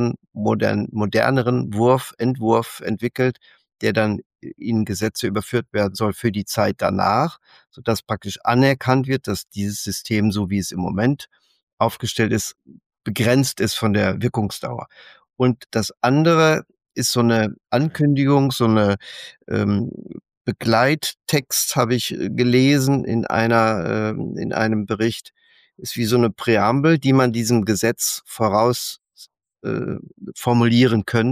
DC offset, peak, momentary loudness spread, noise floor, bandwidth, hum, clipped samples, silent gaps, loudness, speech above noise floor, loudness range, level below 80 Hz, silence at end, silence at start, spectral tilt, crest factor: under 0.1%; -4 dBFS; 11 LU; -50 dBFS; 15.5 kHz; none; under 0.1%; 4.26-4.30 s, 11.63-11.67 s, 11.73-11.77 s, 12.86-12.90 s, 20.37-20.45 s; -20 LUFS; 30 dB; 4 LU; -54 dBFS; 0 s; 0 s; -5.5 dB/octave; 16 dB